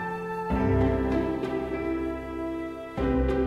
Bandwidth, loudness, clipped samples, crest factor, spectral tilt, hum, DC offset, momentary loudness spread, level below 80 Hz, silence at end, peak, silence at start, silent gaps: 12 kHz; -28 LUFS; under 0.1%; 16 dB; -8.5 dB/octave; none; under 0.1%; 9 LU; -36 dBFS; 0 s; -12 dBFS; 0 s; none